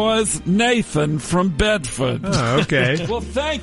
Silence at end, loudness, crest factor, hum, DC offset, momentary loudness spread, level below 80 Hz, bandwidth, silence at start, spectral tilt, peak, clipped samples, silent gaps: 0 s; -19 LUFS; 14 dB; none; under 0.1%; 6 LU; -36 dBFS; 11.5 kHz; 0 s; -4.5 dB/octave; -4 dBFS; under 0.1%; none